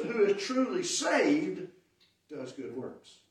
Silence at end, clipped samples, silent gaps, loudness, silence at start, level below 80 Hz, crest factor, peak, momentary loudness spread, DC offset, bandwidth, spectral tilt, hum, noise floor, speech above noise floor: 0.2 s; under 0.1%; none; -30 LUFS; 0 s; -82 dBFS; 16 dB; -14 dBFS; 18 LU; under 0.1%; 12.5 kHz; -3 dB/octave; none; -69 dBFS; 37 dB